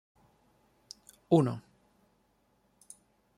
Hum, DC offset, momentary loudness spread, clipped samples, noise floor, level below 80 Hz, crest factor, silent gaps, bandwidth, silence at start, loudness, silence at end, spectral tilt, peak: none; under 0.1%; 27 LU; under 0.1%; -72 dBFS; -74 dBFS; 26 dB; none; 13 kHz; 1.3 s; -29 LUFS; 1.8 s; -8 dB/octave; -10 dBFS